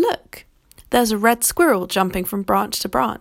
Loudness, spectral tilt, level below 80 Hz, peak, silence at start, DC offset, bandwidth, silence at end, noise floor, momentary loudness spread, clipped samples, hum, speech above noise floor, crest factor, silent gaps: -19 LUFS; -3.5 dB/octave; -46 dBFS; -2 dBFS; 0 s; under 0.1%; 17 kHz; 0.05 s; -50 dBFS; 5 LU; under 0.1%; none; 31 dB; 18 dB; none